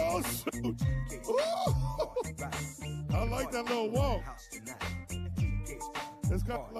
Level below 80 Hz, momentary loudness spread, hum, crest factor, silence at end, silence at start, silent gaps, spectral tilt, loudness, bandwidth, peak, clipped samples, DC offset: -42 dBFS; 9 LU; none; 16 dB; 0 s; 0 s; none; -5.5 dB/octave; -34 LUFS; 14 kHz; -18 dBFS; under 0.1%; under 0.1%